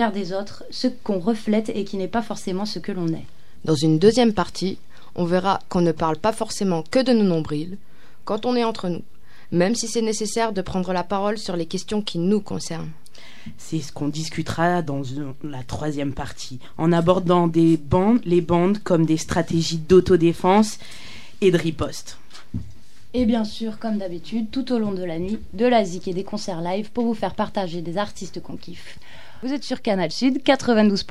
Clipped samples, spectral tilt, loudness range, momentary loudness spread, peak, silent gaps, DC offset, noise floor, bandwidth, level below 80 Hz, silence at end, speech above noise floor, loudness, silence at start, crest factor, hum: under 0.1%; -6 dB/octave; 7 LU; 16 LU; -2 dBFS; none; 3%; -46 dBFS; 13.5 kHz; -48 dBFS; 0.05 s; 25 dB; -22 LUFS; 0 s; 20 dB; none